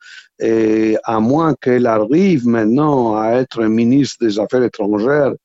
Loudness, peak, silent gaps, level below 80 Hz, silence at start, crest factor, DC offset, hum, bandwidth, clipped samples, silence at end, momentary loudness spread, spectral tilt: -15 LUFS; -2 dBFS; none; -52 dBFS; 0.1 s; 14 dB; under 0.1%; none; 8 kHz; under 0.1%; 0.1 s; 4 LU; -7 dB/octave